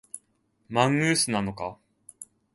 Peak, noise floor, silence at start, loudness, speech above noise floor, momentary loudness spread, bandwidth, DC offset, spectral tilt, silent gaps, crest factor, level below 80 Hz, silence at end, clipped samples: -6 dBFS; -70 dBFS; 0.15 s; -25 LUFS; 45 dB; 23 LU; 12 kHz; under 0.1%; -4 dB/octave; none; 22 dB; -60 dBFS; 0.3 s; under 0.1%